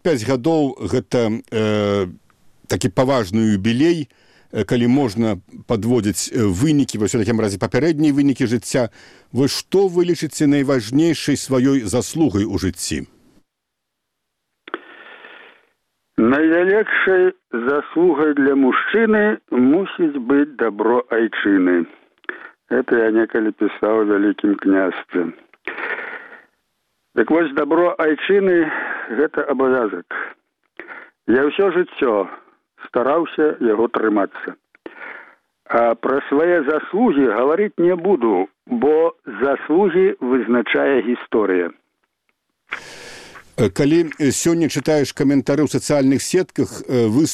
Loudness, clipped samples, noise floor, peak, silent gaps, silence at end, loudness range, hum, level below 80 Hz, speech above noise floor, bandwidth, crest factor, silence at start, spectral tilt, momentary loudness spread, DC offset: -18 LUFS; under 0.1%; -78 dBFS; 0 dBFS; none; 0 s; 5 LU; none; -52 dBFS; 61 dB; 14.5 kHz; 18 dB; 0.05 s; -5.5 dB/octave; 12 LU; under 0.1%